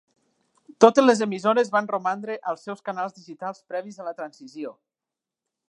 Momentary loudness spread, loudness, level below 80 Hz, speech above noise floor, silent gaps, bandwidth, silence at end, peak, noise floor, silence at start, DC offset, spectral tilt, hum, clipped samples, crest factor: 20 LU; -23 LUFS; -76 dBFS; 65 dB; none; 9.8 kHz; 1 s; 0 dBFS; -88 dBFS; 0.8 s; under 0.1%; -4.5 dB/octave; none; under 0.1%; 24 dB